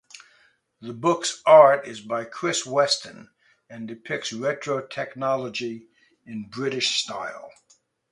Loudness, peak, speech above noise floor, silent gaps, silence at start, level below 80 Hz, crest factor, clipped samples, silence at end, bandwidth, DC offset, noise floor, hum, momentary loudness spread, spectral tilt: -23 LUFS; 0 dBFS; 38 dB; none; 0.8 s; -72 dBFS; 24 dB; under 0.1%; 0.65 s; 11.5 kHz; under 0.1%; -62 dBFS; none; 22 LU; -3 dB/octave